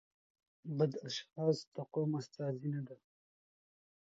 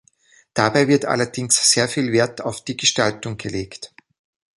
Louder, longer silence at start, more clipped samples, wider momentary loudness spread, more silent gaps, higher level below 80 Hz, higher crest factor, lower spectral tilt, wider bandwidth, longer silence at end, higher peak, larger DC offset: second, -39 LUFS vs -19 LUFS; about the same, 0.65 s vs 0.55 s; neither; second, 8 LU vs 14 LU; first, 1.67-1.72 s vs none; second, -86 dBFS vs -54 dBFS; about the same, 20 dB vs 20 dB; first, -7 dB/octave vs -3 dB/octave; second, 7.6 kHz vs 12 kHz; first, 1.05 s vs 0.75 s; second, -20 dBFS vs -2 dBFS; neither